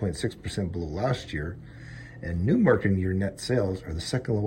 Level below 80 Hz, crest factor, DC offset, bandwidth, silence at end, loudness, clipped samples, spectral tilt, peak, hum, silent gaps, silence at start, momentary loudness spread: -44 dBFS; 20 dB; under 0.1%; 16 kHz; 0 s; -28 LUFS; under 0.1%; -6.5 dB/octave; -6 dBFS; none; none; 0 s; 16 LU